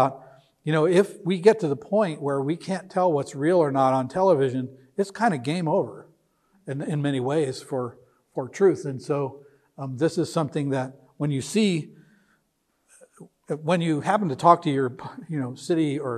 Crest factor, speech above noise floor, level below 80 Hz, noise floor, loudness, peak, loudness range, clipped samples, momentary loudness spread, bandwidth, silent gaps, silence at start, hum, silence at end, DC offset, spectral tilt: 22 dB; 48 dB; -70 dBFS; -72 dBFS; -24 LUFS; -2 dBFS; 5 LU; under 0.1%; 14 LU; 13 kHz; none; 0 s; none; 0 s; under 0.1%; -6.5 dB/octave